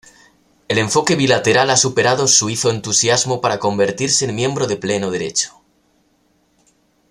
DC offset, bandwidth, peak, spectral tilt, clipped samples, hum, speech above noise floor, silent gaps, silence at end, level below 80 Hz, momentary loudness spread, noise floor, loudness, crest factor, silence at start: under 0.1%; 14.5 kHz; 0 dBFS; -3 dB/octave; under 0.1%; none; 44 dB; none; 1.6 s; -56 dBFS; 7 LU; -60 dBFS; -16 LUFS; 18 dB; 0.7 s